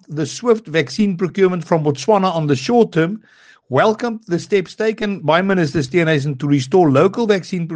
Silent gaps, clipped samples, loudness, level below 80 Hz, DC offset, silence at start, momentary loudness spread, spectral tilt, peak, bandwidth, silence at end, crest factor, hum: none; under 0.1%; -17 LUFS; -56 dBFS; under 0.1%; 0.1 s; 7 LU; -6.5 dB/octave; 0 dBFS; 9.8 kHz; 0 s; 16 dB; none